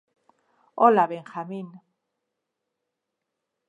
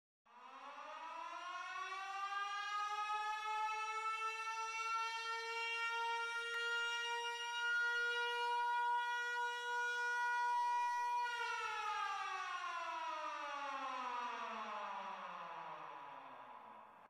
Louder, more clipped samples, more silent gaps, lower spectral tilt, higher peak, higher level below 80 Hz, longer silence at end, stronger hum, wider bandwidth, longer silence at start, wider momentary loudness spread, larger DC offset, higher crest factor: first, -22 LUFS vs -41 LUFS; neither; neither; first, -8 dB/octave vs 0.5 dB/octave; first, -4 dBFS vs -32 dBFS; about the same, -86 dBFS vs -88 dBFS; first, 1.9 s vs 0 s; neither; second, 8.2 kHz vs 15 kHz; first, 0.75 s vs 0.3 s; first, 23 LU vs 13 LU; neither; first, 24 dB vs 10 dB